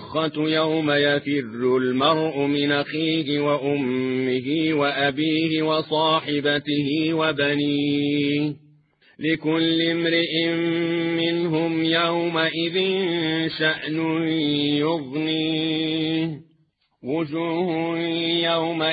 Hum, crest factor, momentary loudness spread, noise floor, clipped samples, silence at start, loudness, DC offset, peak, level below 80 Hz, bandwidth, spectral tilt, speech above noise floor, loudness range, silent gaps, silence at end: none; 16 dB; 4 LU; -65 dBFS; under 0.1%; 0 s; -22 LUFS; under 0.1%; -6 dBFS; -66 dBFS; 5 kHz; -9 dB/octave; 43 dB; 3 LU; none; 0 s